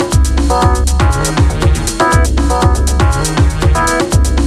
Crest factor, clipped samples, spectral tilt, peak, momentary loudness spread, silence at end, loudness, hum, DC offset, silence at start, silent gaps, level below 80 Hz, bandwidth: 10 dB; under 0.1%; -5 dB/octave; 0 dBFS; 1 LU; 0 s; -12 LUFS; none; under 0.1%; 0 s; none; -14 dBFS; 13.5 kHz